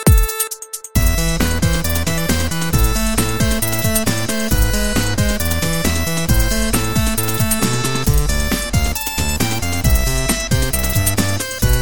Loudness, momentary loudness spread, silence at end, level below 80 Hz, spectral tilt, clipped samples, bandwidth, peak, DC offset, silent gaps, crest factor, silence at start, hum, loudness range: -17 LUFS; 2 LU; 0 s; -22 dBFS; -4 dB/octave; under 0.1%; 17.5 kHz; 0 dBFS; 6%; none; 16 dB; 0 s; none; 0 LU